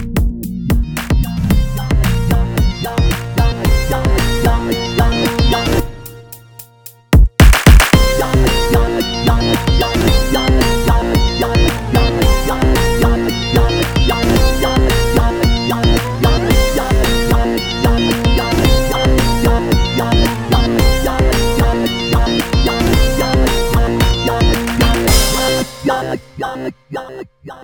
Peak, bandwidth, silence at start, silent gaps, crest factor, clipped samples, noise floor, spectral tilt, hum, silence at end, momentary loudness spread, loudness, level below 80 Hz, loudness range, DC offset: 0 dBFS; over 20 kHz; 0 s; none; 12 dB; 0.2%; -39 dBFS; -5 dB/octave; none; 0 s; 6 LU; -14 LUFS; -16 dBFS; 4 LU; 0.8%